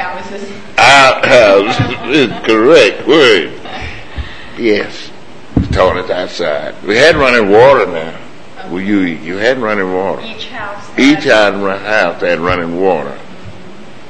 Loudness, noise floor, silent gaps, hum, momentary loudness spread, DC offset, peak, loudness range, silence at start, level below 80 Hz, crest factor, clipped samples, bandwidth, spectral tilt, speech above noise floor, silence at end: -10 LUFS; -34 dBFS; none; none; 19 LU; 4%; 0 dBFS; 7 LU; 0 s; -34 dBFS; 12 dB; 0.6%; 11 kHz; -4.5 dB/octave; 23 dB; 0.2 s